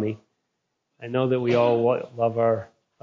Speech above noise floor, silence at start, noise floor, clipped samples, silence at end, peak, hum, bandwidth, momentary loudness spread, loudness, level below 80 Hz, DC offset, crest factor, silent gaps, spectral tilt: 56 dB; 0 s; -78 dBFS; under 0.1%; 0.4 s; -8 dBFS; none; 7.2 kHz; 10 LU; -23 LUFS; -64 dBFS; under 0.1%; 16 dB; none; -8.5 dB/octave